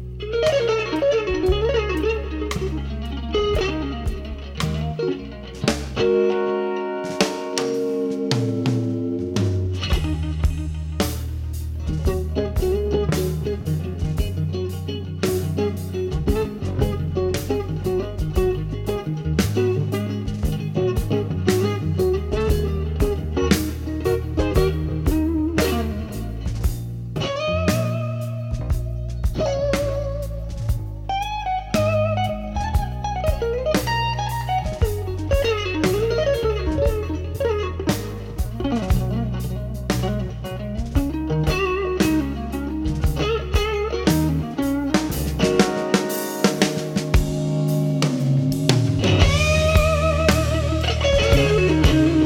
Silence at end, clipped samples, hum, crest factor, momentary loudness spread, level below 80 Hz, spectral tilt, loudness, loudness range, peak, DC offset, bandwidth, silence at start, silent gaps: 0 s; under 0.1%; none; 20 dB; 8 LU; -28 dBFS; -6 dB/octave; -22 LUFS; 5 LU; 0 dBFS; under 0.1%; 17.5 kHz; 0 s; none